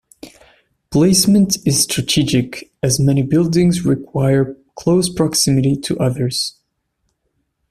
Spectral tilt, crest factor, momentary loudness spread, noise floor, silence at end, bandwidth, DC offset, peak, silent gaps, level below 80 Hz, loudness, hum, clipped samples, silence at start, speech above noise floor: -5 dB/octave; 16 dB; 8 LU; -69 dBFS; 1.2 s; 15.5 kHz; under 0.1%; 0 dBFS; none; -44 dBFS; -16 LUFS; none; under 0.1%; 0.25 s; 54 dB